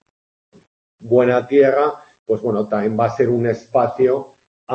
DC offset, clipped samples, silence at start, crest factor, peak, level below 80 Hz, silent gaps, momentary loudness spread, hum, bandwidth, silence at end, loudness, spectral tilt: under 0.1%; under 0.1%; 1.05 s; 16 dB; -2 dBFS; -62 dBFS; 2.19-2.26 s, 4.47-4.67 s; 8 LU; none; 7.2 kHz; 0 s; -17 LUFS; -8.5 dB/octave